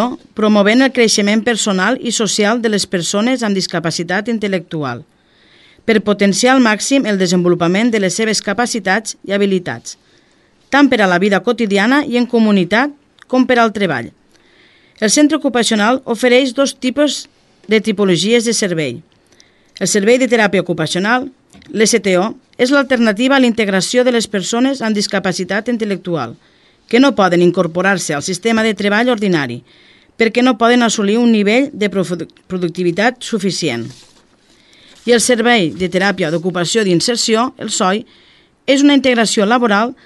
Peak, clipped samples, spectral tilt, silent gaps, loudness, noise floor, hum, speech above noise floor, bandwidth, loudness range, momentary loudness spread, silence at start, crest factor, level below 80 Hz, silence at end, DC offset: 0 dBFS; under 0.1%; -4 dB/octave; none; -14 LUFS; -53 dBFS; none; 39 dB; 12.5 kHz; 3 LU; 9 LU; 0 s; 14 dB; -56 dBFS; 0.1 s; under 0.1%